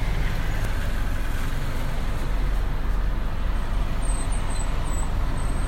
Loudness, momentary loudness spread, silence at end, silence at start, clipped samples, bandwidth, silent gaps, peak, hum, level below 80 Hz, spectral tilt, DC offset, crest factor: -29 LUFS; 2 LU; 0 s; 0 s; under 0.1%; 15.5 kHz; none; -12 dBFS; none; -24 dBFS; -5 dB/octave; under 0.1%; 10 dB